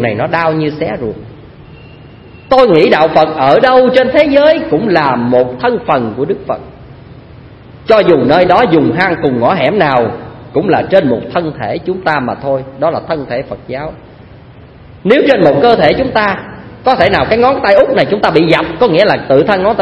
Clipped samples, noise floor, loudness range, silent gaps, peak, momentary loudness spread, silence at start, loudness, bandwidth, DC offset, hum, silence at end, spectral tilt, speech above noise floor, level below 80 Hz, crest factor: 0.4%; -35 dBFS; 6 LU; none; 0 dBFS; 11 LU; 0 s; -10 LUFS; 8 kHz; under 0.1%; none; 0 s; -7.5 dB/octave; 25 dB; -40 dBFS; 10 dB